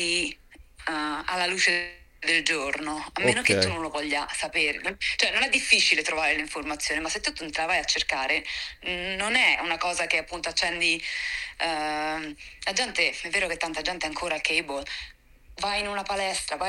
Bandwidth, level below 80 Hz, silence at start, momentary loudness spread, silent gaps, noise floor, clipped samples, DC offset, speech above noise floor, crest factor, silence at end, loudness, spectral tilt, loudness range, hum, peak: 16.5 kHz; -52 dBFS; 0 s; 10 LU; none; -50 dBFS; under 0.1%; under 0.1%; 23 dB; 22 dB; 0 s; -25 LUFS; -1.5 dB/octave; 4 LU; none; -4 dBFS